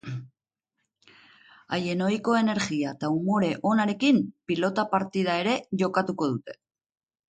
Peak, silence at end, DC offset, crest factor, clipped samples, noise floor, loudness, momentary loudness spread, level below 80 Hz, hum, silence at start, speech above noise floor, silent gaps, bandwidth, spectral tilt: -10 dBFS; 0.75 s; under 0.1%; 18 dB; under 0.1%; -83 dBFS; -26 LUFS; 7 LU; -68 dBFS; none; 0.05 s; 58 dB; none; 9.2 kHz; -6 dB/octave